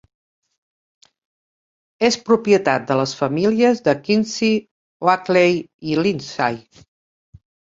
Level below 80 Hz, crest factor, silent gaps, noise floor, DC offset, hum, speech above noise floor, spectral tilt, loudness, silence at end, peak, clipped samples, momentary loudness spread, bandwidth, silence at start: -60 dBFS; 20 dB; 4.71-5.00 s, 5.74-5.79 s; under -90 dBFS; under 0.1%; none; over 72 dB; -5 dB/octave; -18 LUFS; 1.2 s; 0 dBFS; under 0.1%; 7 LU; 7.8 kHz; 2 s